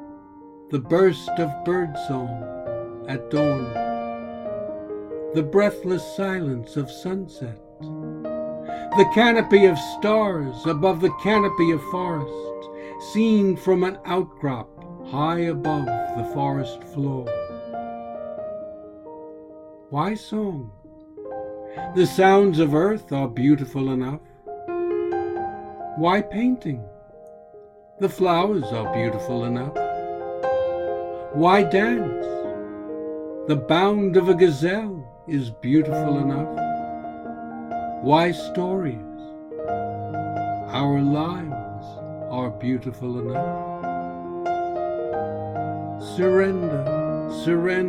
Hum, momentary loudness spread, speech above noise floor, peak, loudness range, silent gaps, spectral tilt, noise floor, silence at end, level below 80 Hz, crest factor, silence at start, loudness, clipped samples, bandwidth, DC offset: none; 16 LU; 26 dB; -2 dBFS; 8 LU; none; -7 dB/octave; -47 dBFS; 0 s; -54 dBFS; 22 dB; 0 s; -23 LUFS; under 0.1%; 15 kHz; under 0.1%